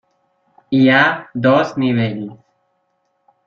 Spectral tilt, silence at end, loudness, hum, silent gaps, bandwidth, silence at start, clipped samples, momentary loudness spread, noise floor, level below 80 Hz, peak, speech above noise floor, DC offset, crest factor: -7 dB/octave; 1.1 s; -15 LUFS; none; none; 6.8 kHz; 0.7 s; under 0.1%; 12 LU; -67 dBFS; -58 dBFS; 0 dBFS; 52 dB; under 0.1%; 18 dB